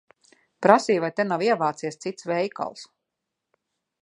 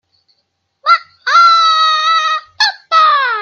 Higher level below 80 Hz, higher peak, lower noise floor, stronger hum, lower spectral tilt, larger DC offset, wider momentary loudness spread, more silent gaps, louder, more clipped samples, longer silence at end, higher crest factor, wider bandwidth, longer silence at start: second, -78 dBFS vs -72 dBFS; about the same, 0 dBFS vs 0 dBFS; first, -83 dBFS vs -66 dBFS; neither; first, -5 dB/octave vs 3.5 dB/octave; neither; first, 14 LU vs 7 LU; neither; second, -24 LUFS vs -10 LUFS; neither; first, 1.2 s vs 0 s; first, 24 dB vs 12 dB; first, 11 kHz vs 7.4 kHz; second, 0.6 s vs 0.85 s